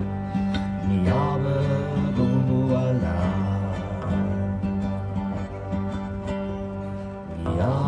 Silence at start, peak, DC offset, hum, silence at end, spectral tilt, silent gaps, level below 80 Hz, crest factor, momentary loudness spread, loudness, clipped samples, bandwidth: 0 s; -10 dBFS; under 0.1%; none; 0 s; -9 dB/octave; none; -40 dBFS; 14 dB; 9 LU; -25 LUFS; under 0.1%; 9.6 kHz